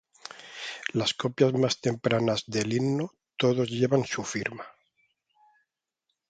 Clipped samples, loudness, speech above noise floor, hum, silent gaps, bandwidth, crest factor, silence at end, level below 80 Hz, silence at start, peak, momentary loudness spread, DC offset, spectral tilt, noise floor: under 0.1%; -27 LUFS; 55 dB; none; none; 9.4 kHz; 20 dB; 1.6 s; -66 dBFS; 0.3 s; -8 dBFS; 15 LU; under 0.1%; -5 dB/octave; -82 dBFS